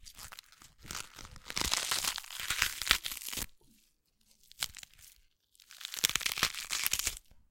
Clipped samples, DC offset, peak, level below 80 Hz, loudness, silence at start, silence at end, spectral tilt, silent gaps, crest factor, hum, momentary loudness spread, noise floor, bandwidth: under 0.1%; under 0.1%; -2 dBFS; -54 dBFS; -33 LUFS; 0 s; 0.15 s; 0.5 dB/octave; none; 36 dB; none; 19 LU; -71 dBFS; 17 kHz